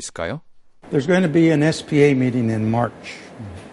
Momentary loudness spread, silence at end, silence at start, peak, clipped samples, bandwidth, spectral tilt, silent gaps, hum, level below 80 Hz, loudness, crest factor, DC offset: 20 LU; 0 s; 0 s; -4 dBFS; under 0.1%; 11.5 kHz; -6.5 dB/octave; none; none; -52 dBFS; -19 LUFS; 16 dB; under 0.1%